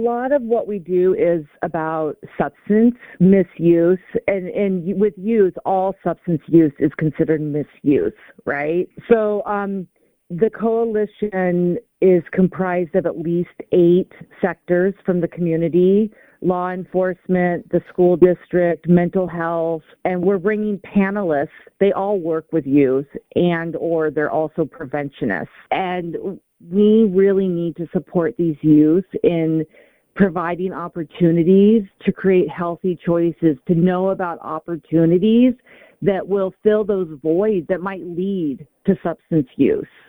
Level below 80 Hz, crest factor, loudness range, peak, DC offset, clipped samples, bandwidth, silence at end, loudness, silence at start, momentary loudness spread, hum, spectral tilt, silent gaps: -52 dBFS; 18 dB; 3 LU; 0 dBFS; under 0.1%; under 0.1%; 16.5 kHz; 0.25 s; -19 LUFS; 0 s; 10 LU; none; -10.5 dB/octave; none